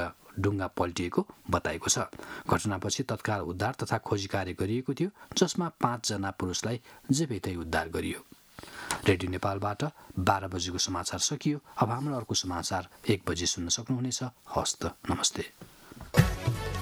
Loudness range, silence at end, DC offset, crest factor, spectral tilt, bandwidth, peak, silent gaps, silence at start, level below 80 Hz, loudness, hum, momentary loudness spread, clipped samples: 2 LU; 0 s; under 0.1%; 24 dB; -4 dB/octave; over 20 kHz; -6 dBFS; none; 0 s; -50 dBFS; -31 LUFS; none; 7 LU; under 0.1%